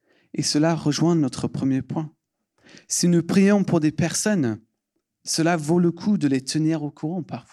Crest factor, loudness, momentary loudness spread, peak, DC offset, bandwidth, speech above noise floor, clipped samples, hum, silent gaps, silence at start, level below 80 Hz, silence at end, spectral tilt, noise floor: 16 dB; -22 LUFS; 12 LU; -8 dBFS; under 0.1%; 14 kHz; 56 dB; under 0.1%; none; none; 0.35 s; -62 dBFS; 0.15 s; -5 dB/octave; -77 dBFS